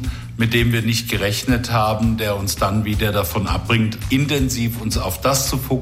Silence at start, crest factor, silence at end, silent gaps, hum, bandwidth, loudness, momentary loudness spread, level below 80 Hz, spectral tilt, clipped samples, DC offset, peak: 0 s; 14 dB; 0 s; none; none; 16.5 kHz; -19 LUFS; 4 LU; -30 dBFS; -4.5 dB/octave; under 0.1%; under 0.1%; -4 dBFS